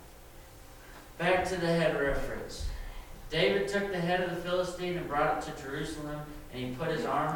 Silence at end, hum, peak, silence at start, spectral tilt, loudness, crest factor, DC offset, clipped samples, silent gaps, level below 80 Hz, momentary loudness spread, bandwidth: 0 s; none; -14 dBFS; 0 s; -5 dB/octave; -32 LUFS; 18 dB; under 0.1%; under 0.1%; none; -46 dBFS; 22 LU; 19 kHz